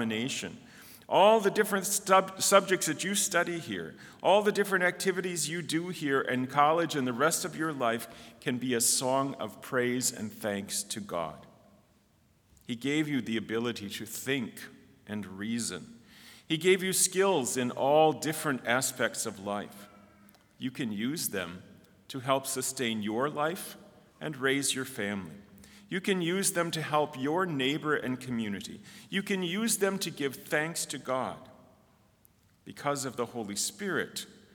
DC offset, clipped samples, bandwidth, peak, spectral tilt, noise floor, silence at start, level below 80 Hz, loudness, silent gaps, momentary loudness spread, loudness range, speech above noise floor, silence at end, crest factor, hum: under 0.1%; under 0.1%; over 20 kHz; -6 dBFS; -3 dB/octave; -66 dBFS; 0 s; -74 dBFS; -30 LUFS; none; 15 LU; 8 LU; 36 dB; 0.25 s; 24 dB; none